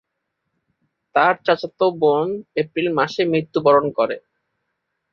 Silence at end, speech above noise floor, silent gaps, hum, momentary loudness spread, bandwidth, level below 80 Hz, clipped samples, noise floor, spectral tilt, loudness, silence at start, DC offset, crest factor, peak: 0.95 s; 58 dB; none; none; 8 LU; 7 kHz; -64 dBFS; under 0.1%; -77 dBFS; -6.5 dB/octave; -19 LUFS; 1.15 s; under 0.1%; 18 dB; -4 dBFS